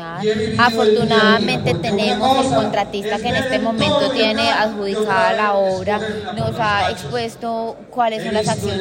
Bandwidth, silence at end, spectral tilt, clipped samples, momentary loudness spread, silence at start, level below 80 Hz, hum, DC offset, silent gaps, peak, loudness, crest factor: 16.5 kHz; 0 s; -5 dB/octave; under 0.1%; 9 LU; 0 s; -50 dBFS; none; under 0.1%; none; 0 dBFS; -17 LUFS; 16 dB